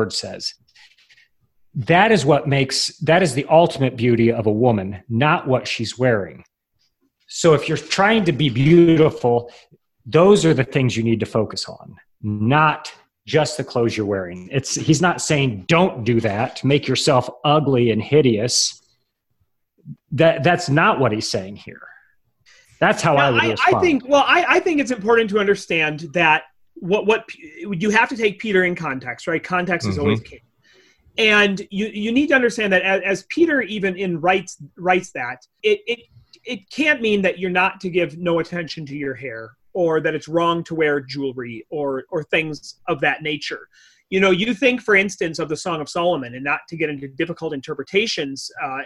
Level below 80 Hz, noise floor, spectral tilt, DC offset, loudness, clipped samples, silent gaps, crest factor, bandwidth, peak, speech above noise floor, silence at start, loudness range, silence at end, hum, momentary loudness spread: -52 dBFS; -69 dBFS; -5 dB/octave; under 0.1%; -19 LUFS; under 0.1%; none; 18 dB; 12.5 kHz; -2 dBFS; 51 dB; 0 s; 5 LU; 0 s; none; 13 LU